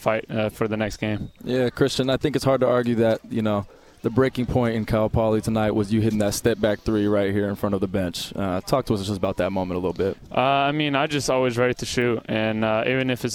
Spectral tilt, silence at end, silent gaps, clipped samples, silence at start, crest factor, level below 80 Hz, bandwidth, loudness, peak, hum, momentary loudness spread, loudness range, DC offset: -5.5 dB/octave; 0 s; none; under 0.1%; 0 s; 16 dB; -44 dBFS; 16.5 kHz; -23 LUFS; -6 dBFS; none; 6 LU; 2 LU; under 0.1%